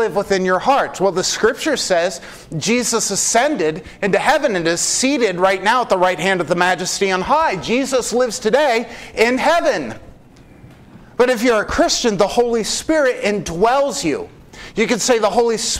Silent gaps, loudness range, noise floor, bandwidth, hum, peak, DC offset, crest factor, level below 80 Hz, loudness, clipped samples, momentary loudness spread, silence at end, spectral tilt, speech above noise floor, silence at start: none; 2 LU; -44 dBFS; 16 kHz; none; 0 dBFS; under 0.1%; 18 dB; -44 dBFS; -16 LUFS; under 0.1%; 7 LU; 0 s; -3 dB/octave; 27 dB; 0 s